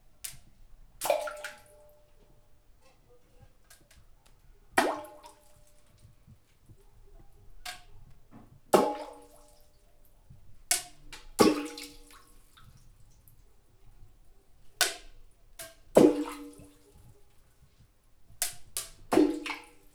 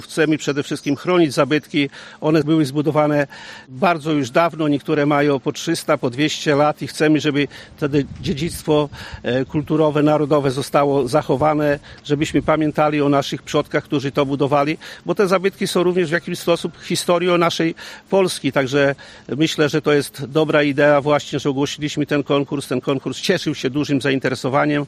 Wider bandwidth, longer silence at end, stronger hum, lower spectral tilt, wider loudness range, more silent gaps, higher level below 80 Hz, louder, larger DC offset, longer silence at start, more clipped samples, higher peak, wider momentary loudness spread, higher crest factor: first, over 20 kHz vs 15 kHz; first, 0.35 s vs 0 s; neither; second, -3.5 dB/octave vs -5.5 dB/octave; first, 10 LU vs 2 LU; neither; second, -58 dBFS vs -50 dBFS; second, -29 LUFS vs -19 LUFS; neither; first, 0.25 s vs 0 s; neither; about the same, -4 dBFS vs -2 dBFS; first, 24 LU vs 7 LU; first, 30 dB vs 16 dB